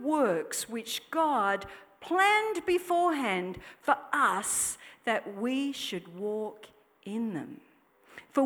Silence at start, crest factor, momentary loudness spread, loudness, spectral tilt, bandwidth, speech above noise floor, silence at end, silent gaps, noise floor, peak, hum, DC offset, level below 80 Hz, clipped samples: 0 s; 20 dB; 12 LU; -30 LUFS; -2.5 dB/octave; over 20 kHz; 30 dB; 0 s; none; -61 dBFS; -10 dBFS; none; under 0.1%; -68 dBFS; under 0.1%